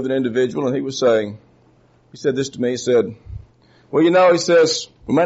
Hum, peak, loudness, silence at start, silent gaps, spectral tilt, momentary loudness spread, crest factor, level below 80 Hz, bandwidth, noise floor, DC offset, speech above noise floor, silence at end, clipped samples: none; -4 dBFS; -18 LUFS; 0 s; none; -4 dB/octave; 14 LU; 14 dB; -50 dBFS; 8 kHz; -54 dBFS; under 0.1%; 37 dB; 0 s; under 0.1%